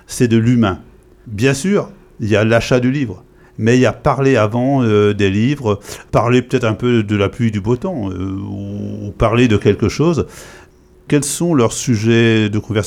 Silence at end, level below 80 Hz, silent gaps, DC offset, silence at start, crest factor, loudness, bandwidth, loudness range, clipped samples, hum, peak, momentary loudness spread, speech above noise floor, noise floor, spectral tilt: 0 s; -40 dBFS; none; under 0.1%; 0.1 s; 14 dB; -15 LUFS; 15 kHz; 3 LU; under 0.1%; none; -2 dBFS; 12 LU; 27 dB; -42 dBFS; -6 dB/octave